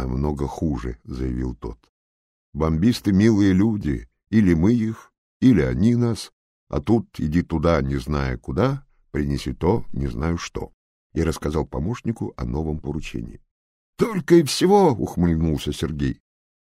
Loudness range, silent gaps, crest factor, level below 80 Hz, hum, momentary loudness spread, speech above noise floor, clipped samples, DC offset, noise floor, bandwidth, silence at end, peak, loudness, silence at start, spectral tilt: 7 LU; 1.89-2.53 s, 5.18-5.40 s, 6.33-6.67 s, 10.74-11.10 s, 13.51-13.93 s; 18 dB; -36 dBFS; none; 14 LU; over 69 dB; under 0.1%; under 0.1%; under -90 dBFS; 15.5 kHz; 0.5 s; -4 dBFS; -22 LUFS; 0 s; -7 dB/octave